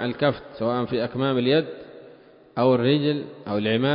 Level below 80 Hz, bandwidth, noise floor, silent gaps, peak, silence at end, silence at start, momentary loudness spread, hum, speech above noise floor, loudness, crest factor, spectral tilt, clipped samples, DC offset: -60 dBFS; 5.4 kHz; -50 dBFS; none; -8 dBFS; 0 s; 0 s; 14 LU; none; 27 dB; -23 LUFS; 16 dB; -11 dB/octave; under 0.1%; under 0.1%